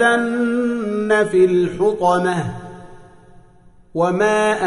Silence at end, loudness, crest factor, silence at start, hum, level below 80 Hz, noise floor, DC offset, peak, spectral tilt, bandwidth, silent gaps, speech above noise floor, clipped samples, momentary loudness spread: 0 s; -17 LUFS; 14 dB; 0 s; none; -52 dBFS; -48 dBFS; under 0.1%; -4 dBFS; -6 dB/octave; 11 kHz; none; 31 dB; under 0.1%; 12 LU